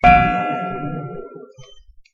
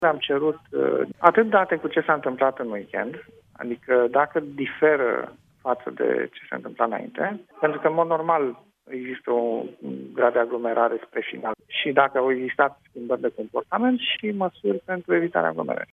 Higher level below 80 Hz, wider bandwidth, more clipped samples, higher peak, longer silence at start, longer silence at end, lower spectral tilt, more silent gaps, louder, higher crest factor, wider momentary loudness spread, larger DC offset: first, -34 dBFS vs -72 dBFS; first, 6.8 kHz vs 3.9 kHz; neither; about the same, 0 dBFS vs 0 dBFS; about the same, 0.05 s vs 0 s; first, 0.35 s vs 0.1 s; about the same, -7.5 dB/octave vs -7.5 dB/octave; neither; first, -19 LUFS vs -24 LUFS; second, 18 dB vs 24 dB; first, 24 LU vs 13 LU; neither